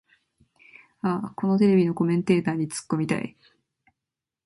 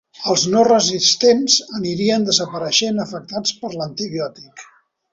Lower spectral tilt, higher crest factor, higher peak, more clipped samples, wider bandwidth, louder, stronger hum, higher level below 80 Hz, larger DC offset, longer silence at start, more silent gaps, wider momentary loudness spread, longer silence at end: first, -7 dB/octave vs -3 dB/octave; about the same, 18 dB vs 18 dB; second, -8 dBFS vs -2 dBFS; neither; first, 11.5 kHz vs 8 kHz; second, -24 LUFS vs -17 LUFS; neither; second, -66 dBFS vs -60 dBFS; neither; first, 1.05 s vs 0.2 s; neither; second, 10 LU vs 13 LU; first, 1.15 s vs 0.5 s